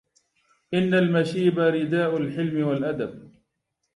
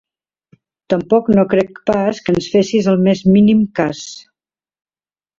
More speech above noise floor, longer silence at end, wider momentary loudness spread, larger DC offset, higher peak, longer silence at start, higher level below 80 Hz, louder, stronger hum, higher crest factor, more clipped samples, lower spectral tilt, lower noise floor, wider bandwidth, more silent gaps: second, 56 dB vs over 76 dB; second, 0.65 s vs 1.2 s; about the same, 8 LU vs 9 LU; neither; second, -8 dBFS vs -2 dBFS; second, 0.7 s vs 0.9 s; second, -66 dBFS vs -48 dBFS; second, -24 LUFS vs -14 LUFS; neither; about the same, 16 dB vs 14 dB; neither; about the same, -7.5 dB/octave vs -7 dB/octave; second, -78 dBFS vs under -90 dBFS; first, 11.5 kHz vs 7.6 kHz; neither